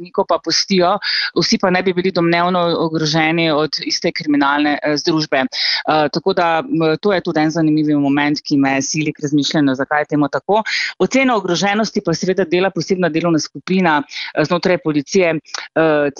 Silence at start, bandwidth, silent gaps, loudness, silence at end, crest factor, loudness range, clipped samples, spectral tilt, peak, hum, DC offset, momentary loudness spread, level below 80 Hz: 0 s; 7.4 kHz; none; -16 LUFS; 0 s; 14 dB; 1 LU; under 0.1%; -4.5 dB/octave; -2 dBFS; none; under 0.1%; 3 LU; -56 dBFS